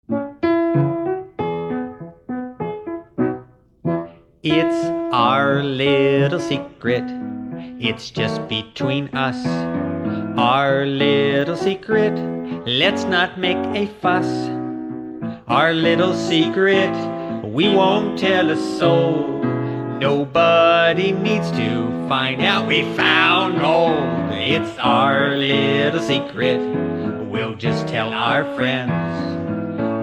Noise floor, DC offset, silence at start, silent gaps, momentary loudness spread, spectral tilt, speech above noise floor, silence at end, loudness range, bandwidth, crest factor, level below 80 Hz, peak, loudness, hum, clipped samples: -40 dBFS; under 0.1%; 0.1 s; none; 11 LU; -6 dB/octave; 22 dB; 0 s; 6 LU; 11 kHz; 16 dB; -56 dBFS; -2 dBFS; -19 LUFS; none; under 0.1%